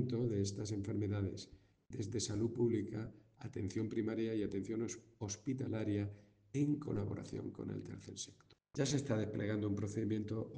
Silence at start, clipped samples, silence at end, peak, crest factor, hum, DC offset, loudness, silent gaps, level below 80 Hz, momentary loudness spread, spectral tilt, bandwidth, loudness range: 0 s; under 0.1%; 0 s; -22 dBFS; 18 dB; none; under 0.1%; -40 LUFS; none; -68 dBFS; 11 LU; -6 dB/octave; 10 kHz; 2 LU